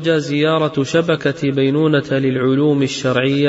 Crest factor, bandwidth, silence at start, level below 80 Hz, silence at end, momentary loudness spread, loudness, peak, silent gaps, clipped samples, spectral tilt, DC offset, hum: 12 dB; 8 kHz; 0 s; -56 dBFS; 0 s; 3 LU; -16 LUFS; -4 dBFS; none; under 0.1%; -5.5 dB/octave; under 0.1%; none